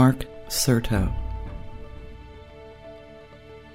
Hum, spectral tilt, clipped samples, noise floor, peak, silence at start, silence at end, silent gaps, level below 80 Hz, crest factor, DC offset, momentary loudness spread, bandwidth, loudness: none; -5 dB/octave; under 0.1%; -46 dBFS; -4 dBFS; 0 s; 0 s; none; -36 dBFS; 22 dB; 0.1%; 24 LU; 16 kHz; -25 LUFS